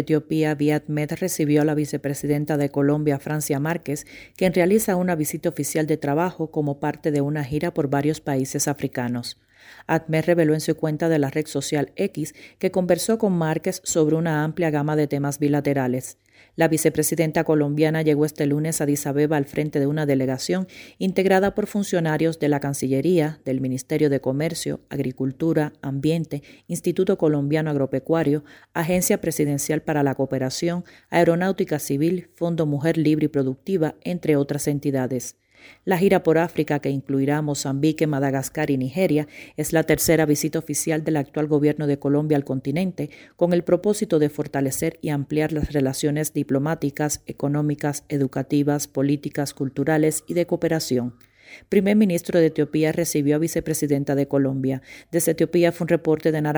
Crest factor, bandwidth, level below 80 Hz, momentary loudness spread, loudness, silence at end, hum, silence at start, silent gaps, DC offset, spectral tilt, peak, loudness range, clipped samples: 18 dB; over 20 kHz; -52 dBFS; 7 LU; -22 LUFS; 0 s; none; 0 s; none; under 0.1%; -6 dB/octave; -4 dBFS; 2 LU; under 0.1%